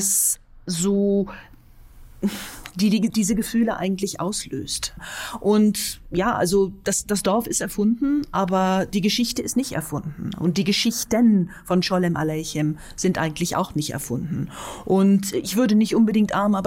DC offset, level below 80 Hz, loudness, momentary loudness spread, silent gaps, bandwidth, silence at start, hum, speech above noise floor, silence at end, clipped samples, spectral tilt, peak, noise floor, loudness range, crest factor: under 0.1%; -46 dBFS; -22 LUFS; 10 LU; none; 16.5 kHz; 0 s; none; 24 dB; 0 s; under 0.1%; -4.5 dB/octave; -8 dBFS; -46 dBFS; 3 LU; 14 dB